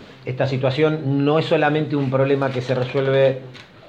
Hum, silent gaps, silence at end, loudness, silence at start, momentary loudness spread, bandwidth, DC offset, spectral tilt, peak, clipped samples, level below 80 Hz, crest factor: none; none; 0.25 s; -19 LUFS; 0 s; 6 LU; 8.2 kHz; under 0.1%; -8 dB/octave; -4 dBFS; under 0.1%; -60 dBFS; 16 dB